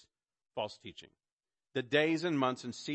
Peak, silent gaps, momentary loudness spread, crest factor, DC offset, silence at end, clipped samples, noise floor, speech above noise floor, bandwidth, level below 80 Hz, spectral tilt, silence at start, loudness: -16 dBFS; 1.32-1.39 s; 19 LU; 20 dB; under 0.1%; 0 s; under 0.1%; under -90 dBFS; over 56 dB; 8.4 kHz; -78 dBFS; -5 dB/octave; 0.55 s; -34 LUFS